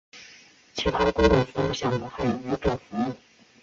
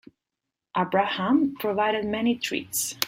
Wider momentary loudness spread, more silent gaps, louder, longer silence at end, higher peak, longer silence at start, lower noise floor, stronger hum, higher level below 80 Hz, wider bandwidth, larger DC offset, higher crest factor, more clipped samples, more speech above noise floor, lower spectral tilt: first, 17 LU vs 5 LU; neither; about the same, -25 LUFS vs -25 LUFS; first, 0.45 s vs 0 s; second, -6 dBFS vs -2 dBFS; second, 0.15 s vs 0.75 s; second, -52 dBFS vs -86 dBFS; neither; first, -40 dBFS vs -64 dBFS; second, 7.8 kHz vs 16.5 kHz; neither; about the same, 20 dB vs 24 dB; neither; second, 28 dB vs 61 dB; first, -6 dB/octave vs -3.5 dB/octave